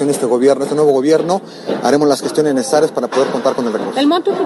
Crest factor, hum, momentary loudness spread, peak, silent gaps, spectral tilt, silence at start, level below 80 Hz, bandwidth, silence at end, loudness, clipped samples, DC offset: 14 dB; none; 6 LU; 0 dBFS; none; -5 dB/octave; 0 s; -62 dBFS; 13 kHz; 0 s; -14 LUFS; under 0.1%; under 0.1%